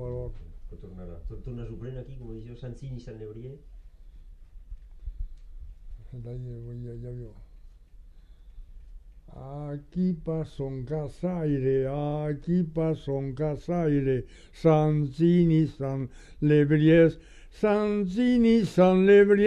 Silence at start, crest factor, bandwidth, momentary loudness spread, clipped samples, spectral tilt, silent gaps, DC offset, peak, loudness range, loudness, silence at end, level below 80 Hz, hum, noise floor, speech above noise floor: 0 s; 18 dB; 9.4 kHz; 22 LU; under 0.1%; -9 dB/octave; none; under 0.1%; -8 dBFS; 20 LU; -25 LUFS; 0 s; -44 dBFS; none; -50 dBFS; 24 dB